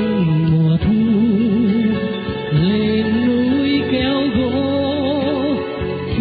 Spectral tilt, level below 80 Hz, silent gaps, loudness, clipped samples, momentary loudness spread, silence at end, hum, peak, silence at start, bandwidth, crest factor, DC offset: -12.5 dB/octave; -36 dBFS; none; -17 LUFS; under 0.1%; 6 LU; 0 s; none; -6 dBFS; 0 s; 4.8 kHz; 10 dB; under 0.1%